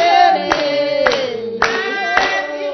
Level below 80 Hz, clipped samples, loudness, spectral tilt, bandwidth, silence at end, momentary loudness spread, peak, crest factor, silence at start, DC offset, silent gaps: -48 dBFS; under 0.1%; -15 LUFS; -3 dB/octave; 6.4 kHz; 0 s; 7 LU; 0 dBFS; 16 dB; 0 s; under 0.1%; none